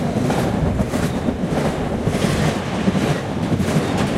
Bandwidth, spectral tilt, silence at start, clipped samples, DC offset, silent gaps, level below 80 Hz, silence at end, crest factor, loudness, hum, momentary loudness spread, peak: 15.5 kHz; -6 dB/octave; 0 s; under 0.1%; under 0.1%; none; -34 dBFS; 0 s; 14 dB; -20 LUFS; none; 3 LU; -4 dBFS